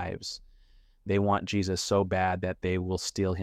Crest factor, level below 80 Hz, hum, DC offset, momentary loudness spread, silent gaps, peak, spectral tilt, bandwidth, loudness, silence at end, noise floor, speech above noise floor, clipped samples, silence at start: 16 dB; -52 dBFS; none; under 0.1%; 11 LU; none; -12 dBFS; -5 dB/octave; 14.5 kHz; -29 LUFS; 0 s; -59 dBFS; 30 dB; under 0.1%; 0 s